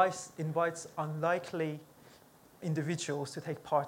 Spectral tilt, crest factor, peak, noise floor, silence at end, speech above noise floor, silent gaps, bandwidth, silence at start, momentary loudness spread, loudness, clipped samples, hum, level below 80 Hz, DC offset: -5.5 dB/octave; 22 dB; -14 dBFS; -60 dBFS; 0 s; 26 dB; none; 17 kHz; 0 s; 7 LU; -35 LUFS; under 0.1%; none; -76 dBFS; under 0.1%